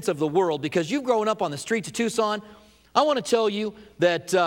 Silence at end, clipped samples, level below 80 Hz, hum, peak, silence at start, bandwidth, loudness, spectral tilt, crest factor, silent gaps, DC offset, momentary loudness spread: 0 s; under 0.1%; -64 dBFS; none; -4 dBFS; 0 s; 17 kHz; -24 LUFS; -4.5 dB/octave; 20 dB; none; under 0.1%; 6 LU